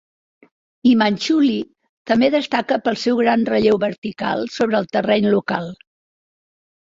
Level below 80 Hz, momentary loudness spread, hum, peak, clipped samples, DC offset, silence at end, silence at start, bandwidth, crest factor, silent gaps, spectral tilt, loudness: -58 dBFS; 8 LU; none; -2 dBFS; under 0.1%; under 0.1%; 1.2 s; 0.85 s; 7.8 kHz; 16 dB; 1.89-2.05 s, 3.98-4.02 s; -5.5 dB/octave; -18 LUFS